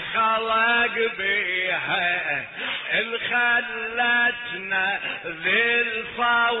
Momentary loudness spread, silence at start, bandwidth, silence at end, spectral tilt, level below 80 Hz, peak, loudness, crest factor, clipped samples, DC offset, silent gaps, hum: 7 LU; 0 s; 4.1 kHz; 0 s; -5.5 dB/octave; -60 dBFS; -10 dBFS; -22 LUFS; 14 dB; under 0.1%; under 0.1%; none; none